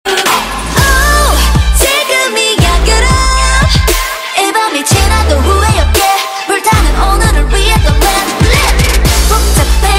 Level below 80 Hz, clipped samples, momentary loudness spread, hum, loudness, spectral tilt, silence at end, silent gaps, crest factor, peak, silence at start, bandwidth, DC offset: -12 dBFS; 0.1%; 3 LU; none; -9 LUFS; -3.5 dB/octave; 0 s; none; 8 dB; 0 dBFS; 0.05 s; 16.5 kHz; under 0.1%